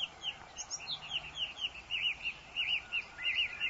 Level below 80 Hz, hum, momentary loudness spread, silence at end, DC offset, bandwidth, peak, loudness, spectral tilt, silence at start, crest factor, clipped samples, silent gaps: -64 dBFS; none; 8 LU; 0 s; under 0.1%; 8 kHz; -24 dBFS; -36 LUFS; 0.5 dB/octave; 0 s; 14 dB; under 0.1%; none